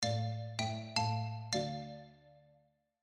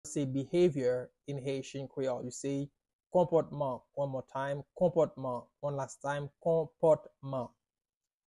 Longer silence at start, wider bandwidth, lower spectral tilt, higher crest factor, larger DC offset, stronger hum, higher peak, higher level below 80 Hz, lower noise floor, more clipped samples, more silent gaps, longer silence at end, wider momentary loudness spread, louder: about the same, 0 s vs 0.05 s; about the same, 11 kHz vs 11.5 kHz; second, -4.5 dB/octave vs -6.5 dB/octave; about the same, 22 dB vs 18 dB; neither; neither; about the same, -18 dBFS vs -16 dBFS; about the same, -72 dBFS vs -68 dBFS; second, -72 dBFS vs under -90 dBFS; neither; second, none vs 2.95-2.99 s; second, 0.65 s vs 0.8 s; first, 14 LU vs 11 LU; second, -38 LUFS vs -34 LUFS